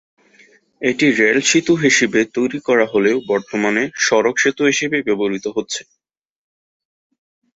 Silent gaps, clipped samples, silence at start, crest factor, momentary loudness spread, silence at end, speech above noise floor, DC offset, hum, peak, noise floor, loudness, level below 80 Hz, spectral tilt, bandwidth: none; under 0.1%; 0.8 s; 16 dB; 9 LU; 1.75 s; 35 dB; under 0.1%; none; -2 dBFS; -51 dBFS; -16 LUFS; -60 dBFS; -3.5 dB/octave; 8 kHz